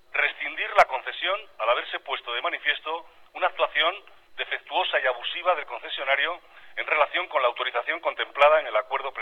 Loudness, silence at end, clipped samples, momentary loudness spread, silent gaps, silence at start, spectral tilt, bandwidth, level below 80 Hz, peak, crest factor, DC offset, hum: -25 LUFS; 0 s; under 0.1%; 12 LU; none; 0.15 s; -1.5 dB/octave; 9.4 kHz; -66 dBFS; -6 dBFS; 20 dB; under 0.1%; none